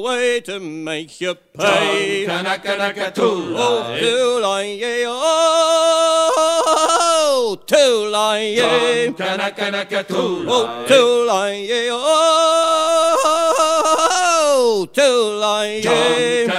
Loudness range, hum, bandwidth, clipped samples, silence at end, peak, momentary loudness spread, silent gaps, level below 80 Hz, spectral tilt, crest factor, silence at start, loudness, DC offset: 4 LU; none; 15.5 kHz; under 0.1%; 0 s; -2 dBFS; 7 LU; none; -64 dBFS; -2 dB/octave; 16 dB; 0 s; -16 LUFS; under 0.1%